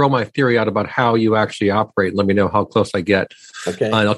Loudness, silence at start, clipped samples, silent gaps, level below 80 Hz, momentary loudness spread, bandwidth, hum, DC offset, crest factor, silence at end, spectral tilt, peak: -17 LUFS; 0 s; under 0.1%; none; -54 dBFS; 4 LU; 12 kHz; none; under 0.1%; 16 dB; 0 s; -6.5 dB/octave; -2 dBFS